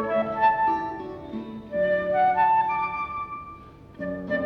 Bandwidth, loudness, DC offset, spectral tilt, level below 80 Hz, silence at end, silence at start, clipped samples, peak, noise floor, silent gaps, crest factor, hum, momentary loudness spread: 6 kHz; -24 LUFS; under 0.1%; -7.5 dB/octave; -54 dBFS; 0 s; 0 s; under 0.1%; -10 dBFS; -45 dBFS; none; 16 dB; none; 15 LU